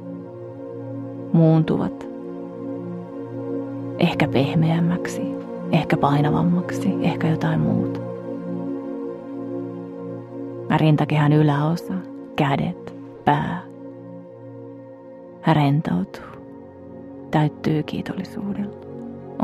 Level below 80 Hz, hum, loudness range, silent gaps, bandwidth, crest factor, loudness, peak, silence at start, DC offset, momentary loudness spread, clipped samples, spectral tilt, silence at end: -54 dBFS; 60 Hz at -50 dBFS; 6 LU; none; 12 kHz; 20 dB; -23 LUFS; -2 dBFS; 0 s; under 0.1%; 20 LU; under 0.1%; -8 dB/octave; 0 s